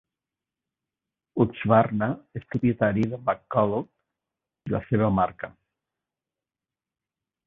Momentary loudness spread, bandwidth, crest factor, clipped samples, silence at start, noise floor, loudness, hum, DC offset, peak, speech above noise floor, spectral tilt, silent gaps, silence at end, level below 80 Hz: 15 LU; 6 kHz; 22 dB; under 0.1%; 1.35 s; under -90 dBFS; -25 LUFS; none; under 0.1%; -4 dBFS; over 66 dB; -10 dB/octave; none; 2 s; -54 dBFS